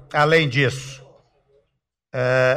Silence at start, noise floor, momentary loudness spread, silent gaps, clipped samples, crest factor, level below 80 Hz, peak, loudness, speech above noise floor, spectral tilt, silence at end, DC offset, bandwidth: 0.1 s; -74 dBFS; 17 LU; none; under 0.1%; 16 dB; -54 dBFS; -6 dBFS; -19 LUFS; 56 dB; -5.5 dB/octave; 0 s; under 0.1%; 14.5 kHz